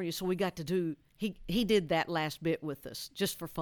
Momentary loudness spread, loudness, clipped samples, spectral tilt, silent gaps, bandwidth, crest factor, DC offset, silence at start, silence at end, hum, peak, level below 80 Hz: 10 LU; -33 LUFS; under 0.1%; -5 dB/octave; none; 19 kHz; 18 dB; under 0.1%; 0 s; 0 s; none; -16 dBFS; -56 dBFS